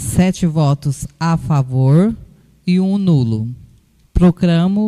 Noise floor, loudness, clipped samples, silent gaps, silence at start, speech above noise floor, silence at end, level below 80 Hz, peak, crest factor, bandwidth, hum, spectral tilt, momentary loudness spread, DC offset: -50 dBFS; -15 LUFS; under 0.1%; none; 0 s; 36 dB; 0 s; -30 dBFS; -2 dBFS; 12 dB; 13.5 kHz; none; -7.5 dB/octave; 10 LU; under 0.1%